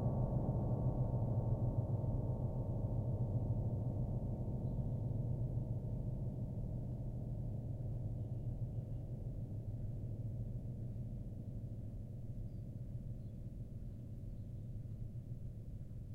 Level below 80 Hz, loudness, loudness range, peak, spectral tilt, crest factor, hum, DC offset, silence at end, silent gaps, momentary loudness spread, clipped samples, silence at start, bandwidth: -48 dBFS; -43 LUFS; 10 LU; -24 dBFS; -11.5 dB/octave; 16 dB; none; under 0.1%; 0 s; none; 11 LU; under 0.1%; 0 s; 1.6 kHz